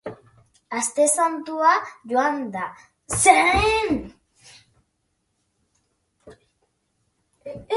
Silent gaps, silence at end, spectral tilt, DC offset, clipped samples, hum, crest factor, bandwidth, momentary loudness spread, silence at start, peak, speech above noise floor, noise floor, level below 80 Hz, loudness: none; 0 s; -2.5 dB/octave; under 0.1%; under 0.1%; none; 24 dB; 12 kHz; 19 LU; 0.05 s; 0 dBFS; 52 dB; -73 dBFS; -46 dBFS; -20 LUFS